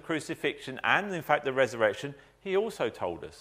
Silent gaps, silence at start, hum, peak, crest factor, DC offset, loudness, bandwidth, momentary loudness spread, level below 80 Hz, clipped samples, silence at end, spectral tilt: none; 0.05 s; none; -8 dBFS; 22 dB; under 0.1%; -30 LUFS; 15.5 kHz; 10 LU; -66 dBFS; under 0.1%; 0 s; -4.5 dB/octave